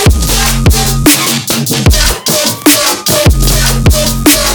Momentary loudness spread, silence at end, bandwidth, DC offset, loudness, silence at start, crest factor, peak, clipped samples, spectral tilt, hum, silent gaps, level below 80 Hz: 3 LU; 0 s; over 20 kHz; under 0.1%; -8 LUFS; 0 s; 8 dB; 0 dBFS; 0.7%; -3.5 dB/octave; none; none; -14 dBFS